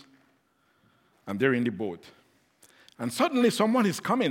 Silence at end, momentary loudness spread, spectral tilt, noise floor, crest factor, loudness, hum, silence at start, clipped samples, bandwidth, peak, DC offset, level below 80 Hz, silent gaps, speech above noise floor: 0 s; 14 LU; -5 dB/octave; -68 dBFS; 20 dB; -27 LUFS; none; 1.25 s; under 0.1%; 16.5 kHz; -8 dBFS; under 0.1%; -78 dBFS; none; 43 dB